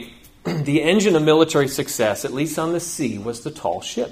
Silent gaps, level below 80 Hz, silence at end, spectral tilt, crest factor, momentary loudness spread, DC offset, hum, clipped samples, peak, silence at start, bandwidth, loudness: none; -54 dBFS; 0 s; -4.5 dB/octave; 18 dB; 12 LU; under 0.1%; none; under 0.1%; -2 dBFS; 0 s; 15.5 kHz; -20 LUFS